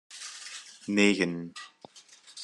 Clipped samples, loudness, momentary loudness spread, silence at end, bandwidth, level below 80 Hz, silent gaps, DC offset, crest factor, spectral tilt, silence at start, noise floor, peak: under 0.1%; -27 LUFS; 22 LU; 0 s; 11.5 kHz; -70 dBFS; none; under 0.1%; 22 dB; -4 dB/octave; 0.1 s; -55 dBFS; -10 dBFS